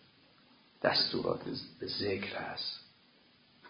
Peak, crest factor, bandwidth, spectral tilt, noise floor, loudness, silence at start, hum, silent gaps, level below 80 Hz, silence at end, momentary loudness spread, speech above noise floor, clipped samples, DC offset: -12 dBFS; 26 dB; 5.4 kHz; -7.5 dB/octave; -65 dBFS; -34 LUFS; 0.8 s; none; none; -66 dBFS; 0 s; 12 LU; 30 dB; under 0.1%; under 0.1%